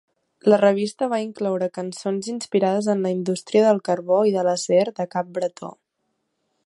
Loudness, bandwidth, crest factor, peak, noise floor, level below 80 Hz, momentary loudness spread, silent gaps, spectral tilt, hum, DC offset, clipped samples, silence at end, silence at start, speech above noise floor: -22 LUFS; 11.5 kHz; 18 dB; -4 dBFS; -75 dBFS; -74 dBFS; 10 LU; none; -5.5 dB/octave; none; under 0.1%; under 0.1%; 0.95 s; 0.45 s; 54 dB